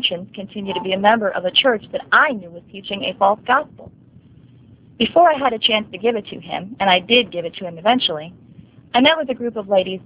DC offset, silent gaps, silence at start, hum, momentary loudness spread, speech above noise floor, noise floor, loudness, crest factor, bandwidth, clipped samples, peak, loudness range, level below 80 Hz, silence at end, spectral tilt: under 0.1%; none; 0 s; none; 15 LU; 28 dB; -47 dBFS; -17 LUFS; 18 dB; 4 kHz; under 0.1%; 0 dBFS; 2 LU; -56 dBFS; 0.05 s; -8 dB/octave